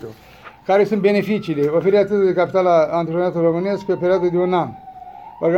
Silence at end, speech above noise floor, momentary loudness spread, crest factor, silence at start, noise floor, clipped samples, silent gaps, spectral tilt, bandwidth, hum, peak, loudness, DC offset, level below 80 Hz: 0 s; 20 dB; 17 LU; 14 dB; 0 s; -37 dBFS; under 0.1%; none; -8 dB/octave; 8.2 kHz; none; -4 dBFS; -18 LUFS; under 0.1%; -56 dBFS